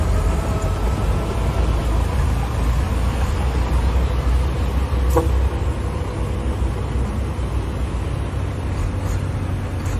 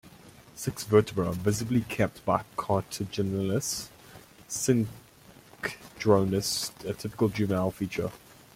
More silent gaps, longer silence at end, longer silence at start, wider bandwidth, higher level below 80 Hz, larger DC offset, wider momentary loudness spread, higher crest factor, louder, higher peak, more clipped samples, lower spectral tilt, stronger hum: neither; second, 0 s vs 0.4 s; about the same, 0 s vs 0.05 s; second, 13.5 kHz vs 16.5 kHz; first, -22 dBFS vs -58 dBFS; neither; second, 5 LU vs 12 LU; second, 16 dB vs 22 dB; first, -22 LUFS vs -29 LUFS; first, -4 dBFS vs -8 dBFS; neither; first, -7 dB/octave vs -5 dB/octave; neither